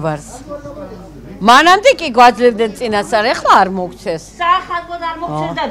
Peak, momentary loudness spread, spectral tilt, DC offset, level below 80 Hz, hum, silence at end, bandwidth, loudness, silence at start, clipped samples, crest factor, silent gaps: 0 dBFS; 21 LU; -4 dB/octave; under 0.1%; -42 dBFS; none; 0 s; 16.5 kHz; -12 LUFS; 0 s; 0.5%; 14 dB; none